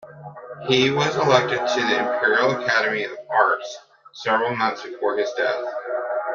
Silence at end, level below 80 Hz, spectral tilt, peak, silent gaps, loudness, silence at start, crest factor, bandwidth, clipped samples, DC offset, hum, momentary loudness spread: 0 s; -66 dBFS; -4 dB/octave; -2 dBFS; none; -21 LUFS; 0 s; 20 dB; 7.4 kHz; under 0.1%; under 0.1%; none; 12 LU